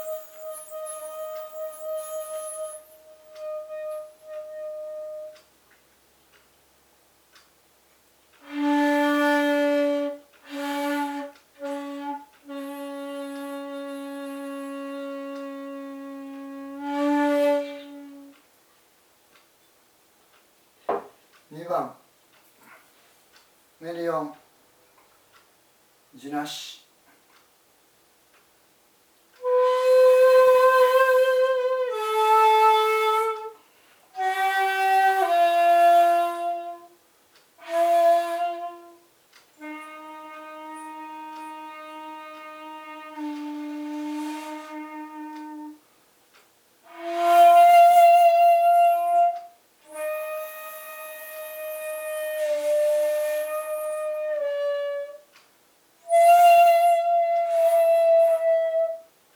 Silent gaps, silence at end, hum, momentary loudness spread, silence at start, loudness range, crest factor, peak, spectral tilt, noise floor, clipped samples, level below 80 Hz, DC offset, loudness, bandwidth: none; 0.35 s; none; 22 LU; 0 s; 20 LU; 18 dB; -6 dBFS; -3 dB/octave; -61 dBFS; under 0.1%; -80 dBFS; under 0.1%; -21 LUFS; over 20 kHz